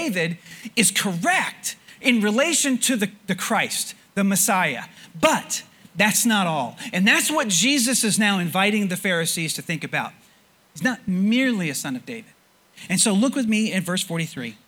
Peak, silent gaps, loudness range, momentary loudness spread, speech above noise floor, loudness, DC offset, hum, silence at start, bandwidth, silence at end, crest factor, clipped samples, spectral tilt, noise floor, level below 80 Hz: -2 dBFS; none; 5 LU; 11 LU; 35 dB; -21 LUFS; under 0.1%; none; 0 s; 20 kHz; 0.15 s; 22 dB; under 0.1%; -3 dB/octave; -57 dBFS; -66 dBFS